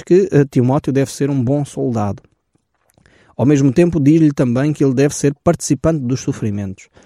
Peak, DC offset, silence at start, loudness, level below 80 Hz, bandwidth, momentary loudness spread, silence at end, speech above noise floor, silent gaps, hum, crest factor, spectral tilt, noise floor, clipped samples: -2 dBFS; under 0.1%; 0.05 s; -15 LUFS; -44 dBFS; 14 kHz; 10 LU; 0.3 s; 50 dB; none; none; 14 dB; -7 dB/octave; -64 dBFS; under 0.1%